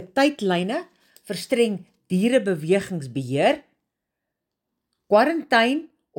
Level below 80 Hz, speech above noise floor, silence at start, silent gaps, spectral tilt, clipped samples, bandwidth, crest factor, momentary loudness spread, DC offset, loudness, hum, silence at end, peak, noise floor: -68 dBFS; 61 dB; 0 s; none; -5.5 dB/octave; under 0.1%; 17 kHz; 18 dB; 11 LU; under 0.1%; -22 LUFS; none; 0.3 s; -4 dBFS; -83 dBFS